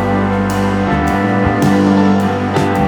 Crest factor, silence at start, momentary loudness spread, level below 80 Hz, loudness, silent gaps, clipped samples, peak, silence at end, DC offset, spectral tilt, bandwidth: 12 dB; 0 s; 4 LU; -32 dBFS; -13 LUFS; none; under 0.1%; 0 dBFS; 0 s; under 0.1%; -7 dB/octave; 19 kHz